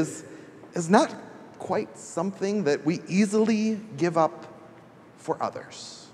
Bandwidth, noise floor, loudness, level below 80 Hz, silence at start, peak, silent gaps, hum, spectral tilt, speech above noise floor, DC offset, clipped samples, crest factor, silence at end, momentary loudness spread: 12 kHz; -50 dBFS; -26 LUFS; -76 dBFS; 0 s; -4 dBFS; none; none; -5.5 dB/octave; 25 dB; under 0.1%; under 0.1%; 24 dB; 0.05 s; 20 LU